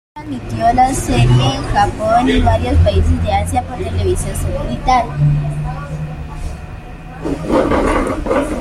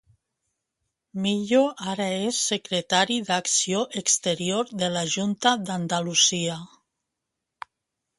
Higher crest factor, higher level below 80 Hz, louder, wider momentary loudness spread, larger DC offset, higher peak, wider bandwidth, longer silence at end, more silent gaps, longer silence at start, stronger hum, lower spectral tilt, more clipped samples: second, 14 dB vs 22 dB; first, -24 dBFS vs -68 dBFS; first, -15 LUFS vs -23 LUFS; first, 15 LU vs 10 LU; neither; about the same, -2 dBFS vs -4 dBFS; first, 14 kHz vs 11.5 kHz; second, 0 s vs 1.55 s; neither; second, 0.15 s vs 1.15 s; neither; first, -6 dB/octave vs -2.5 dB/octave; neither